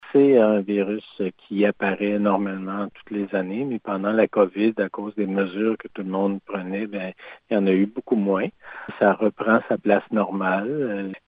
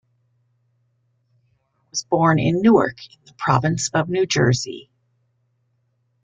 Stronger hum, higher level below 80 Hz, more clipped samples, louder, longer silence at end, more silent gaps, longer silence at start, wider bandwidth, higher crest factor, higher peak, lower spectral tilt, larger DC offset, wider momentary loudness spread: neither; second, -70 dBFS vs -56 dBFS; neither; second, -23 LUFS vs -19 LUFS; second, 0.1 s vs 1.4 s; neither; second, 0.05 s vs 1.95 s; second, 4.8 kHz vs 9.4 kHz; about the same, 18 dB vs 20 dB; about the same, -4 dBFS vs -2 dBFS; first, -10.5 dB/octave vs -5.5 dB/octave; neither; second, 10 LU vs 15 LU